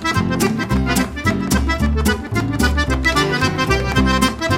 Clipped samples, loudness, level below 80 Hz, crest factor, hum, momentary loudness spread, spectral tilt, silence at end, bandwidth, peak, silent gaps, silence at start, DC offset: under 0.1%; -17 LUFS; -24 dBFS; 16 dB; none; 3 LU; -5 dB/octave; 0 s; 16.5 kHz; -2 dBFS; none; 0 s; under 0.1%